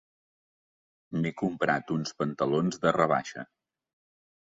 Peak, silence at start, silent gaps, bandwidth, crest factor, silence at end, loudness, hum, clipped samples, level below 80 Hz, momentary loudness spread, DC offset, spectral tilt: -8 dBFS; 1.1 s; none; 7.8 kHz; 22 dB; 0.95 s; -29 LUFS; none; under 0.1%; -68 dBFS; 13 LU; under 0.1%; -6 dB/octave